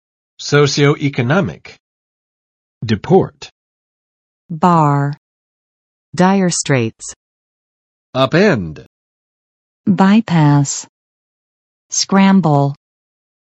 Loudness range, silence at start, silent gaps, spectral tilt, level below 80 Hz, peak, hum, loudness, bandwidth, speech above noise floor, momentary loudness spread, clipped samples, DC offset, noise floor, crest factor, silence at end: 5 LU; 0.4 s; 1.80-2.81 s, 3.52-4.49 s, 5.17-6.12 s, 7.16-8.13 s, 8.86-9.84 s, 10.89-11.89 s; -5.5 dB/octave; -54 dBFS; 0 dBFS; none; -14 LUFS; 8.8 kHz; over 77 dB; 16 LU; under 0.1%; under 0.1%; under -90 dBFS; 16 dB; 0.7 s